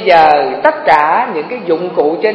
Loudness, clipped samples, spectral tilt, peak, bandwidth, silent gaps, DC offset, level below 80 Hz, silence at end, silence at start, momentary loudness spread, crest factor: -11 LUFS; 0.4%; -6 dB/octave; 0 dBFS; 8 kHz; none; under 0.1%; -50 dBFS; 0 s; 0 s; 9 LU; 10 dB